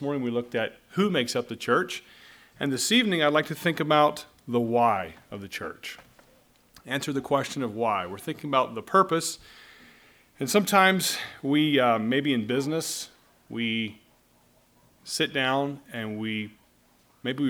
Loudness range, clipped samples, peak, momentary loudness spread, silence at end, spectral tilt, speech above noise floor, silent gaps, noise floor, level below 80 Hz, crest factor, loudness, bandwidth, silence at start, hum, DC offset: 7 LU; under 0.1%; -4 dBFS; 14 LU; 0 s; -4 dB/octave; 36 dB; none; -62 dBFS; -68 dBFS; 22 dB; -26 LUFS; over 20 kHz; 0 s; none; under 0.1%